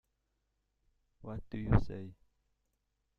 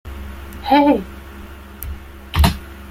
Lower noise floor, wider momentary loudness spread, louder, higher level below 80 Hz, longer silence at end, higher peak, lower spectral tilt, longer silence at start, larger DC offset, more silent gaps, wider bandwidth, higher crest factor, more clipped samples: first, -82 dBFS vs -36 dBFS; second, 19 LU vs 23 LU; second, -36 LUFS vs -17 LUFS; second, -48 dBFS vs -28 dBFS; first, 1.05 s vs 0 s; second, -12 dBFS vs 0 dBFS; first, -10 dB/octave vs -6 dB/octave; first, 1.25 s vs 0.05 s; neither; neither; second, 5.8 kHz vs 16.5 kHz; first, 26 dB vs 20 dB; neither